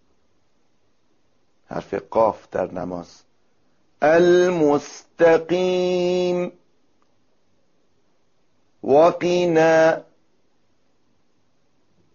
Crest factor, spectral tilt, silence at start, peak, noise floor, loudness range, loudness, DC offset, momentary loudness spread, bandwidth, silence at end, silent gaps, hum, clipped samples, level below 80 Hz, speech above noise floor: 16 dB; -4.5 dB/octave; 1.7 s; -4 dBFS; -68 dBFS; 8 LU; -19 LUFS; under 0.1%; 16 LU; 7.2 kHz; 2.15 s; none; none; under 0.1%; -60 dBFS; 50 dB